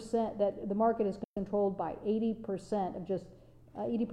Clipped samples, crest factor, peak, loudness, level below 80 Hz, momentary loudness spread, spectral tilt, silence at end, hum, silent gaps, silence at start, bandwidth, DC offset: under 0.1%; 16 dB; -18 dBFS; -34 LUFS; -62 dBFS; 8 LU; -8 dB/octave; 0 s; none; 1.24-1.34 s; 0 s; 10.5 kHz; under 0.1%